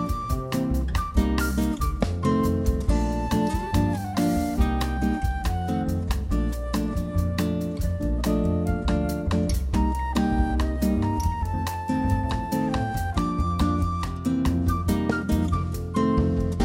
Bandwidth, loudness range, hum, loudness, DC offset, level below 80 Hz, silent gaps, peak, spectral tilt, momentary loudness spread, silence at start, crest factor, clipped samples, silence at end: 16 kHz; 2 LU; none; -25 LUFS; under 0.1%; -28 dBFS; none; -8 dBFS; -7 dB/octave; 4 LU; 0 s; 16 dB; under 0.1%; 0 s